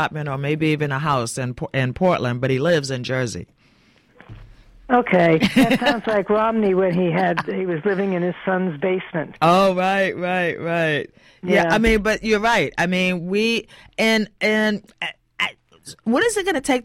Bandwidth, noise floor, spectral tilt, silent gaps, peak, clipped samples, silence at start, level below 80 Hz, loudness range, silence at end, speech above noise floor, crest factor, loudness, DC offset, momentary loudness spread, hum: 16 kHz; -56 dBFS; -5.5 dB/octave; none; -4 dBFS; under 0.1%; 0 s; -44 dBFS; 4 LU; 0 s; 36 dB; 16 dB; -20 LUFS; under 0.1%; 9 LU; none